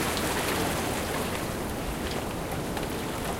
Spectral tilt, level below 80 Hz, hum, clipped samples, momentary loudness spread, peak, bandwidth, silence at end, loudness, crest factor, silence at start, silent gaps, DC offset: -4 dB/octave; -42 dBFS; none; under 0.1%; 5 LU; -12 dBFS; 17 kHz; 0 s; -30 LUFS; 18 dB; 0 s; none; under 0.1%